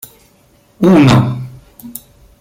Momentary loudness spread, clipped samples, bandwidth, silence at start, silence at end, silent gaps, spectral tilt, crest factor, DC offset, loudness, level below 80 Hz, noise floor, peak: 23 LU; under 0.1%; 17 kHz; 0.8 s; 0.5 s; none; -7 dB/octave; 14 dB; under 0.1%; -10 LUFS; -40 dBFS; -50 dBFS; 0 dBFS